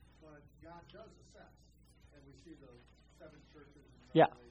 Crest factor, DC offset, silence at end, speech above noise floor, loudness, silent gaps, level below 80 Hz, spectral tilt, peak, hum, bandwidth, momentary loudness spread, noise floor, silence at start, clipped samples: 28 dB; under 0.1%; 0.25 s; 21 dB; -31 LUFS; none; -66 dBFS; -7.5 dB/octave; -12 dBFS; none; 8.6 kHz; 31 LU; -59 dBFS; 4.15 s; under 0.1%